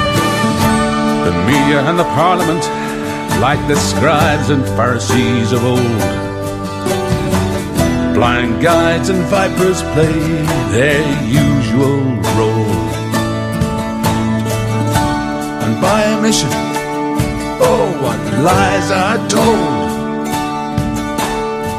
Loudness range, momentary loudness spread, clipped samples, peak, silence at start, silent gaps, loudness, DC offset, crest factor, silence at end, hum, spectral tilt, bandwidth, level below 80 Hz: 2 LU; 6 LU; under 0.1%; 0 dBFS; 0 s; none; -14 LUFS; under 0.1%; 14 dB; 0 s; none; -5.5 dB/octave; 15.5 kHz; -30 dBFS